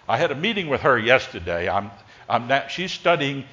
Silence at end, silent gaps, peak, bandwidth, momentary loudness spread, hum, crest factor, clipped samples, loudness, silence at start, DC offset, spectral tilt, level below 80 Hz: 0.05 s; none; 0 dBFS; 7.6 kHz; 9 LU; none; 22 dB; under 0.1%; -21 LUFS; 0.1 s; under 0.1%; -5 dB/octave; -50 dBFS